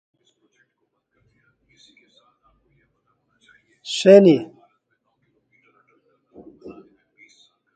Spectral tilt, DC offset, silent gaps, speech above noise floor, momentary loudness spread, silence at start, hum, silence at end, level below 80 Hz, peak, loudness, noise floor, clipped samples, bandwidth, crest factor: -6 dB/octave; under 0.1%; none; 58 dB; 32 LU; 3.85 s; none; 1.05 s; -70 dBFS; 0 dBFS; -15 LUFS; -73 dBFS; under 0.1%; 9 kHz; 24 dB